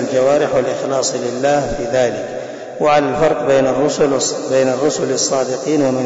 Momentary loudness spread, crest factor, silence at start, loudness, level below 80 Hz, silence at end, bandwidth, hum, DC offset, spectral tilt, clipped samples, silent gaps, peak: 5 LU; 10 dB; 0 s; -16 LUFS; -44 dBFS; 0 s; 8 kHz; none; 0.1%; -4 dB/octave; under 0.1%; none; -4 dBFS